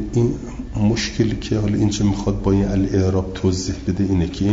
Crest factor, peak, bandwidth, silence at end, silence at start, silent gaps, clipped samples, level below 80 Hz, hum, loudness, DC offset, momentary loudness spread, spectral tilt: 14 dB; -6 dBFS; 7.8 kHz; 0 s; 0 s; none; under 0.1%; -32 dBFS; none; -20 LUFS; under 0.1%; 4 LU; -6.5 dB/octave